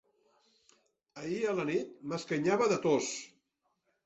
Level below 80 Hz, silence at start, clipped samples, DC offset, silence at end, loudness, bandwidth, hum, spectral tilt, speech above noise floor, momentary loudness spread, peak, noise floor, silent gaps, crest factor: -74 dBFS; 1.15 s; under 0.1%; under 0.1%; 0.8 s; -32 LUFS; 8.2 kHz; none; -4.5 dB/octave; 48 dB; 13 LU; -16 dBFS; -80 dBFS; none; 18 dB